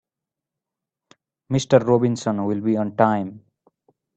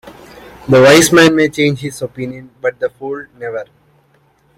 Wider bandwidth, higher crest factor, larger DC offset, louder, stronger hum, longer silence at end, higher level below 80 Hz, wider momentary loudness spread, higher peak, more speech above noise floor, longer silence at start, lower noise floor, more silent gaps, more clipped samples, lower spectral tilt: second, 8.6 kHz vs 16.5 kHz; first, 22 dB vs 14 dB; neither; second, -20 LUFS vs -11 LUFS; neither; second, 0.8 s vs 0.95 s; second, -62 dBFS vs -48 dBFS; second, 9 LU vs 19 LU; about the same, -2 dBFS vs 0 dBFS; first, 67 dB vs 42 dB; first, 1.5 s vs 0.05 s; first, -87 dBFS vs -54 dBFS; neither; neither; first, -6.5 dB/octave vs -4.5 dB/octave